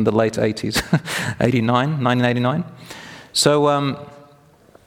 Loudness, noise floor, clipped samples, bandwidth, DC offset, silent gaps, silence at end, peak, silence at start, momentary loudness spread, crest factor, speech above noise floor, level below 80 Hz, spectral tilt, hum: -19 LUFS; -51 dBFS; under 0.1%; 17.5 kHz; under 0.1%; none; 0.7 s; 0 dBFS; 0 s; 17 LU; 20 dB; 32 dB; -48 dBFS; -5 dB/octave; none